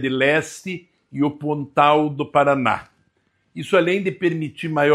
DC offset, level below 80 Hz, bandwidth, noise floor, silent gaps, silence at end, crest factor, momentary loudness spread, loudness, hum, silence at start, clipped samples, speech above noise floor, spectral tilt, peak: under 0.1%; -62 dBFS; 13 kHz; -66 dBFS; none; 0 s; 18 dB; 15 LU; -20 LUFS; none; 0 s; under 0.1%; 47 dB; -6 dB/octave; -2 dBFS